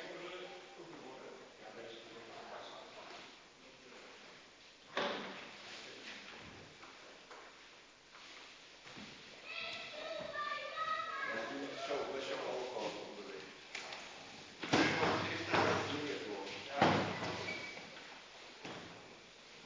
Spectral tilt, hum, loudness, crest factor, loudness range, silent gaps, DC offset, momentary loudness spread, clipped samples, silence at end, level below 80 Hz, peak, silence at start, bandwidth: -4 dB/octave; none; -40 LUFS; 28 dB; 16 LU; none; under 0.1%; 21 LU; under 0.1%; 0 s; -72 dBFS; -14 dBFS; 0 s; 7.6 kHz